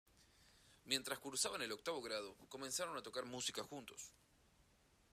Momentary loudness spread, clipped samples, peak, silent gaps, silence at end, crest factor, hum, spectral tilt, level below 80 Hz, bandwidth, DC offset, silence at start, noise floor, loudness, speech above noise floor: 13 LU; under 0.1%; -20 dBFS; none; 0.5 s; 28 dB; none; -1.5 dB/octave; -78 dBFS; 15 kHz; under 0.1%; 0.15 s; -74 dBFS; -44 LUFS; 28 dB